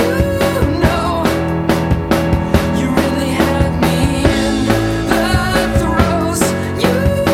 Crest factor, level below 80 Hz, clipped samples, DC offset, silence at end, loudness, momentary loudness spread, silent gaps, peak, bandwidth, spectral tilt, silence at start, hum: 14 dB; -24 dBFS; under 0.1%; under 0.1%; 0 s; -15 LUFS; 2 LU; none; 0 dBFS; 16.5 kHz; -5.5 dB/octave; 0 s; none